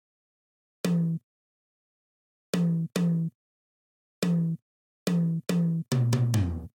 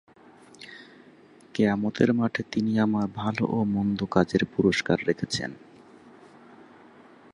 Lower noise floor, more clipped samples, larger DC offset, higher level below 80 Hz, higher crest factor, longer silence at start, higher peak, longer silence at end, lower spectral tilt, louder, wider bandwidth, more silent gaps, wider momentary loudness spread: first, under -90 dBFS vs -53 dBFS; neither; neither; about the same, -54 dBFS vs -56 dBFS; about the same, 18 dB vs 22 dB; first, 0.85 s vs 0.6 s; second, -12 dBFS vs -6 dBFS; second, 0.05 s vs 1.75 s; about the same, -7 dB/octave vs -6 dB/octave; about the same, -28 LUFS vs -26 LUFS; first, 16.5 kHz vs 11 kHz; first, 1.23-2.53 s, 3.35-4.22 s, 4.62-5.06 s vs none; second, 8 LU vs 16 LU